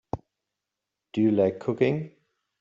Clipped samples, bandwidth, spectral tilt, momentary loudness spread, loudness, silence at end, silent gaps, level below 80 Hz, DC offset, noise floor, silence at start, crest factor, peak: under 0.1%; 7.4 kHz; -9 dB/octave; 16 LU; -25 LUFS; 0.55 s; none; -60 dBFS; under 0.1%; -86 dBFS; 0.15 s; 18 dB; -10 dBFS